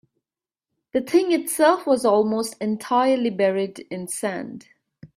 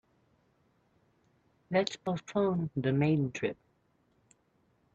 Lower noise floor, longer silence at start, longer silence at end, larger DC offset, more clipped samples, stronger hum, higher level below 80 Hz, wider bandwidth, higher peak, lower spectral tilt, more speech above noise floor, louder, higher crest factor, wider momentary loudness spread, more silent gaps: first, under -90 dBFS vs -72 dBFS; second, 0.95 s vs 1.7 s; second, 0.1 s vs 1.4 s; neither; neither; neither; about the same, -68 dBFS vs -68 dBFS; first, 16 kHz vs 8.2 kHz; first, -4 dBFS vs -14 dBFS; second, -4.5 dB/octave vs -7 dB/octave; first, over 69 dB vs 41 dB; first, -21 LUFS vs -32 LUFS; about the same, 18 dB vs 20 dB; first, 11 LU vs 8 LU; neither